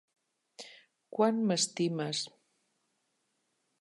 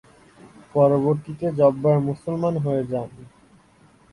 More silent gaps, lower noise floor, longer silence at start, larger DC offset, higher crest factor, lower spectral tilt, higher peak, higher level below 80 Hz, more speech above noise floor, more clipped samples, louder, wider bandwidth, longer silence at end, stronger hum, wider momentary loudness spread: neither; first, -79 dBFS vs -55 dBFS; first, 0.6 s vs 0.45 s; neither; about the same, 22 dB vs 18 dB; second, -4 dB/octave vs -10 dB/octave; second, -14 dBFS vs -4 dBFS; second, -88 dBFS vs -58 dBFS; first, 48 dB vs 34 dB; neither; second, -31 LUFS vs -22 LUFS; about the same, 11.5 kHz vs 11 kHz; first, 1.5 s vs 0.85 s; neither; first, 21 LU vs 10 LU